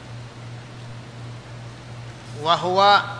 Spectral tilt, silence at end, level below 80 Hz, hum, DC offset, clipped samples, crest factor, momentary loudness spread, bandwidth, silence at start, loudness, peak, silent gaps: -4.5 dB/octave; 0 s; -56 dBFS; none; under 0.1%; under 0.1%; 20 dB; 22 LU; 10.5 kHz; 0 s; -18 LUFS; -4 dBFS; none